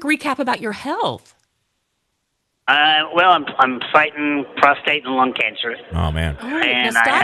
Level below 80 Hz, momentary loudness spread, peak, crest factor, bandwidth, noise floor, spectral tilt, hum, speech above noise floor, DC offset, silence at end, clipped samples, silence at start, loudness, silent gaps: -38 dBFS; 10 LU; 0 dBFS; 18 dB; 13 kHz; -72 dBFS; -4.5 dB/octave; none; 54 dB; under 0.1%; 0 s; under 0.1%; 0 s; -17 LUFS; none